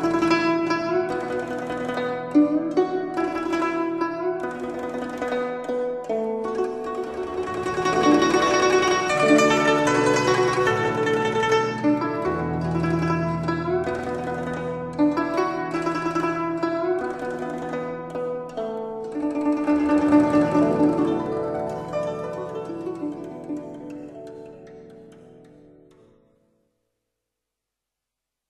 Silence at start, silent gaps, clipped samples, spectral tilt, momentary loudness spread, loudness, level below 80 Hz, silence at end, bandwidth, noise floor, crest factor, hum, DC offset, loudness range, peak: 0 s; none; under 0.1%; -5.5 dB/octave; 12 LU; -23 LUFS; -52 dBFS; 3.1 s; 12 kHz; -85 dBFS; 18 dB; none; under 0.1%; 12 LU; -4 dBFS